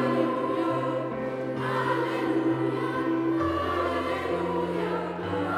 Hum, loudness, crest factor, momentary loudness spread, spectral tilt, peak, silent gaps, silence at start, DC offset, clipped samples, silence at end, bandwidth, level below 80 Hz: none; -28 LUFS; 16 dB; 4 LU; -7 dB/octave; -12 dBFS; none; 0 s; under 0.1%; under 0.1%; 0 s; 13 kHz; -62 dBFS